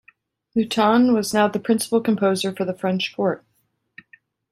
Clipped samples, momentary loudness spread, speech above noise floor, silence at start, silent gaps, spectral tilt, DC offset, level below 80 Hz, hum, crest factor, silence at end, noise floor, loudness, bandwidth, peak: under 0.1%; 8 LU; 49 dB; 0.55 s; none; -5 dB/octave; under 0.1%; -64 dBFS; none; 18 dB; 1.15 s; -69 dBFS; -20 LUFS; 14 kHz; -4 dBFS